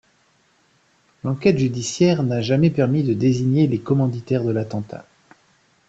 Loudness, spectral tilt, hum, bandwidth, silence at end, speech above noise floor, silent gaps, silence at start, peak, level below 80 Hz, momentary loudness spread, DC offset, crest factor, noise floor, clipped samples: -20 LUFS; -7 dB/octave; none; 8.2 kHz; 0.85 s; 42 dB; none; 1.25 s; -2 dBFS; -56 dBFS; 11 LU; under 0.1%; 18 dB; -61 dBFS; under 0.1%